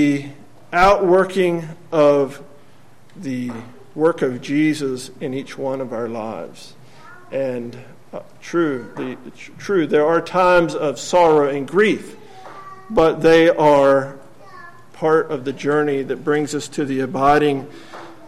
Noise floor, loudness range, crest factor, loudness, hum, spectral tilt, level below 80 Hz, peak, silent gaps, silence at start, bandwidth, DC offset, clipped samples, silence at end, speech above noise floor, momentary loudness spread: -50 dBFS; 10 LU; 16 dB; -18 LUFS; none; -5.5 dB/octave; -46 dBFS; -4 dBFS; none; 0 s; 13.5 kHz; 0.8%; under 0.1%; 0.15 s; 32 dB; 22 LU